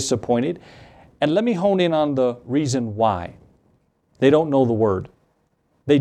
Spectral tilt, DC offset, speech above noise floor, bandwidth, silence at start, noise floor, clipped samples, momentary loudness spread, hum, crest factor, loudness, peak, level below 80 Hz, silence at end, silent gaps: -6 dB/octave; under 0.1%; 46 dB; 12 kHz; 0 s; -66 dBFS; under 0.1%; 11 LU; none; 18 dB; -20 LUFS; -2 dBFS; -58 dBFS; 0 s; none